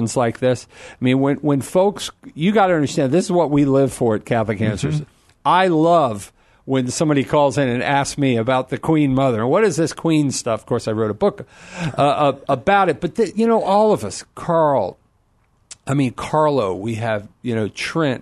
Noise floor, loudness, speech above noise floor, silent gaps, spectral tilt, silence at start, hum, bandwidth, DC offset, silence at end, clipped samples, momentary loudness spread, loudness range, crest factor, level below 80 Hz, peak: -60 dBFS; -18 LUFS; 42 dB; none; -6 dB/octave; 0 s; none; 12.5 kHz; under 0.1%; 0 s; under 0.1%; 8 LU; 2 LU; 16 dB; -50 dBFS; -2 dBFS